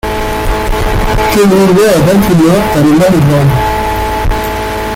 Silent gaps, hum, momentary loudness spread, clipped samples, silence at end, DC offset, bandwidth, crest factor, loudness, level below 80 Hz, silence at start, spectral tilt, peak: none; none; 8 LU; under 0.1%; 0 s; under 0.1%; 17 kHz; 8 dB; -9 LUFS; -20 dBFS; 0.05 s; -6 dB/octave; 0 dBFS